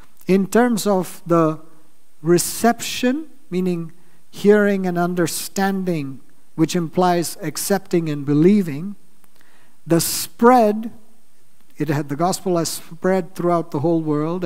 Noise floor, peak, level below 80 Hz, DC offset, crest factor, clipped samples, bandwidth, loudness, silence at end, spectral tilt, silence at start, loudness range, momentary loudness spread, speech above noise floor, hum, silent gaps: -59 dBFS; 0 dBFS; -62 dBFS; 2%; 20 dB; under 0.1%; 16 kHz; -19 LUFS; 0 s; -5.5 dB/octave; 0.3 s; 3 LU; 12 LU; 41 dB; none; none